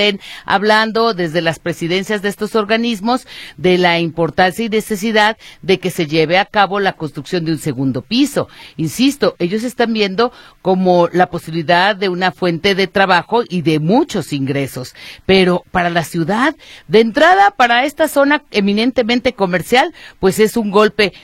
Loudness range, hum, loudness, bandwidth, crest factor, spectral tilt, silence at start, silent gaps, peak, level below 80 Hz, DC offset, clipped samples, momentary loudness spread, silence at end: 4 LU; none; -15 LUFS; 16.5 kHz; 14 dB; -5 dB/octave; 0 s; none; 0 dBFS; -46 dBFS; under 0.1%; under 0.1%; 8 LU; 0.05 s